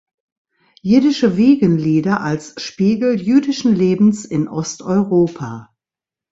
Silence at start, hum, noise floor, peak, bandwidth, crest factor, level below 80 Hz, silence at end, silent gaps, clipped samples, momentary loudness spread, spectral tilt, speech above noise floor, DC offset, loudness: 0.85 s; none; -89 dBFS; -2 dBFS; 8 kHz; 14 dB; -54 dBFS; 0.7 s; none; under 0.1%; 11 LU; -6.5 dB/octave; 74 dB; under 0.1%; -16 LUFS